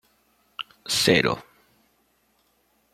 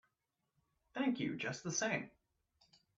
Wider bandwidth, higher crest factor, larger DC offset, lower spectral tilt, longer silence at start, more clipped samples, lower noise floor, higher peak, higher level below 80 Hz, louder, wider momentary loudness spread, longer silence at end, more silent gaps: first, 16.5 kHz vs 8 kHz; first, 24 dB vs 18 dB; neither; about the same, -3.5 dB/octave vs -3.5 dB/octave; second, 0.6 s vs 0.95 s; neither; second, -67 dBFS vs -87 dBFS; first, -4 dBFS vs -24 dBFS; first, -60 dBFS vs -80 dBFS; first, -22 LUFS vs -39 LUFS; first, 18 LU vs 10 LU; first, 1.55 s vs 0.9 s; neither